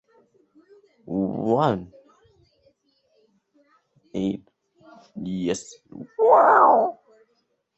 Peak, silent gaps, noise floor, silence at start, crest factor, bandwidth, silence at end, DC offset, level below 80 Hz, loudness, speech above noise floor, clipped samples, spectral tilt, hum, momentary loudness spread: -4 dBFS; none; -71 dBFS; 1.05 s; 22 dB; 8.4 kHz; 0.85 s; under 0.1%; -62 dBFS; -21 LUFS; 50 dB; under 0.1%; -6.5 dB/octave; none; 22 LU